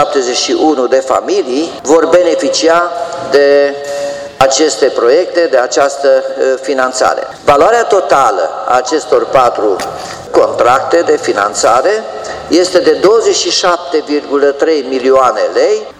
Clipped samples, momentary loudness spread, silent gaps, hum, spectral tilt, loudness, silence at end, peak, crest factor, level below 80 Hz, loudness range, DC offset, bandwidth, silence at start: 0.5%; 6 LU; none; none; -2.5 dB/octave; -10 LUFS; 0.1 s; 0 dBFS; 10 dB; -48 dBFS; 1 LU; under 0.1%; 13.5 kHz; 0 s